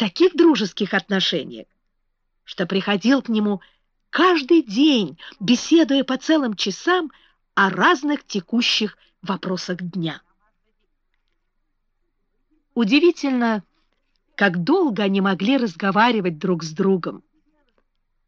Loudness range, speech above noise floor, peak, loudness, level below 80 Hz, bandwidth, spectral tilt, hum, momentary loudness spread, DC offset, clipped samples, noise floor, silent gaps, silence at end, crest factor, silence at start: 7 LU; 51 dB; -6 dBFS; -20 LUFS; -64 dBFS; 7.4 kHz; -5 dB/octave; none; 12 LU; under 0.1%; under 0.1%; -70 dBFS; none; 1.1 s; 16 dB; 0 s